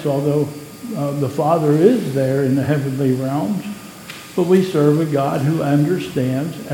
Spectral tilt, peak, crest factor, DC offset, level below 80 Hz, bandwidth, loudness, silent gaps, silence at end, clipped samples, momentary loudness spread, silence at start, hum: -7.5 dB/octave; 0 dBFS; 18 dB; under 0.1%; -56 dBFS; 17 kHz; -18 LUFS; none; 0 s; under 0.1%; 12 LU; 0 s; none